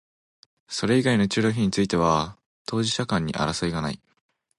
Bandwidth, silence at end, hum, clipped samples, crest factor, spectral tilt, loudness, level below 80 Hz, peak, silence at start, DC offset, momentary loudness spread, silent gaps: 11.5 kHz; 0.6 s; none; under 0.1%; 18 dB; -5 dB/octave; -24 LUFS; -50 dBFS; -8 dBFS; 0.7 s; under 0.1%; 12 LU; 2.46-2.65 s